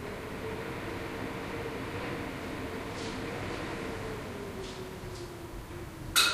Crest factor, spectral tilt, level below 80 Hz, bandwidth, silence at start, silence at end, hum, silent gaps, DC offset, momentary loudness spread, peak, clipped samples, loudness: 26 dB; -3 dB/octave; -50 dBFS; 15.5 kHz; 0 s; 0 s; none; none; under 0.1%; 6 LU; -10 dBFS; under 0.1%; -37 LUFS